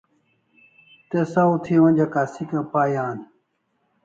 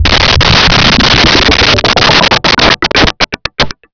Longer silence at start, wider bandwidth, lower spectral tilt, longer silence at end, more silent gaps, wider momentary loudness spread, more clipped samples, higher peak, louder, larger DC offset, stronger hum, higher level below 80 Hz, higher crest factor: first, 1.1 s vs 0 s; first, 7.6 kHz vs 5.4 kHz; first, -9 dB/octave vs -3.5 dB/octave; first, 0.8 s vs 0.2 s; neither; first, 11 LU vs 8 LU; second, under 0.1% vs 0.7%; second, -6 dBFS vs 0 dBFS; second, -21 LUFS vs -6 LUFS; neither; neither; second, -64 dBFS vs -20 dBFS; first, 16 dB vs 8 dB